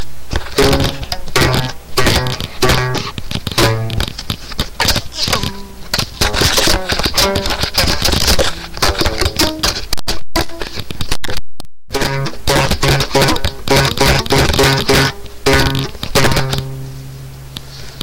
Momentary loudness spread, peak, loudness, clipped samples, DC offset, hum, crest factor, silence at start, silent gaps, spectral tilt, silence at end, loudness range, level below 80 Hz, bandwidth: 12 LU; -2 dBFS; -15 LUFS; under 0.1%; under 0.1%; none; 12 dB; 0 s; none; -3.5 dB/octave; 0 s; 5 LU; -24 dBFS; 17 kHz